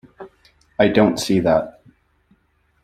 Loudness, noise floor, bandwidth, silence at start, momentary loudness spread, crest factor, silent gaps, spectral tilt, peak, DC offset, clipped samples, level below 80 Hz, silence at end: -17 LUFS; -63 dBFS; 14.5 kHz; 0.2 s; 16 LU; 20 dB; none; -5.5 dB/octave; -2 dBFS; under 0.1%; under 0.1%; -52 dBFS; 1.15 s